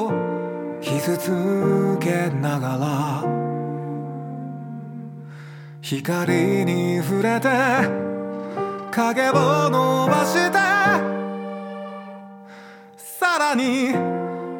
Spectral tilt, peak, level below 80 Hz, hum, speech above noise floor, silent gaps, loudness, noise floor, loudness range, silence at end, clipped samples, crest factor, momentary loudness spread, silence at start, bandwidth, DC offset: -5.5 dB/octave; -4 dBFS; -76 dBFS; none; 23 dB; none; -21 LUFS; -43 dBFS; 7 LU; 0 s; under 0.1%; 18 dB; 18 LU; 0 s; 19 kHz; under 0.1%